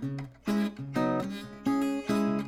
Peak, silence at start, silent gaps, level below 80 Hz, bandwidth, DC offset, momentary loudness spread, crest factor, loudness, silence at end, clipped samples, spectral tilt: -16 dBFS; 0 s; none; -60 dBFS; 15 kHz; under 0.1%; 8 LU; 14 dB; -31 LUFS; 0 s; under 0.1%; -6.5 dB/octave